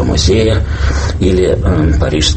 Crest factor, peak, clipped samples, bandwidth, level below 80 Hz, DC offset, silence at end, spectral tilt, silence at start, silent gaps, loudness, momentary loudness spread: 10 dB; 0 dBFS; under 0.1%; 8.8 kHz; -16 dBFS; under 0.1%; 0 s; -5.5 dB/octave; 0 s; none; -12 LUFS; 5 LU